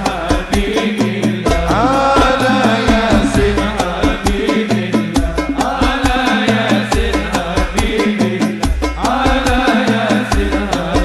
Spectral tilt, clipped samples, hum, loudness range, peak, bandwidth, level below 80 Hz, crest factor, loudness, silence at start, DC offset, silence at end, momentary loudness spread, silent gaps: -5 dB/octave; under 0.1%; none; 2 LU; -2 dBFS; 14.5 kHz; -22 dBFS; 12 dB; -14 LUFS; 0 s; under 0.1%; 0 s; 5 LU; none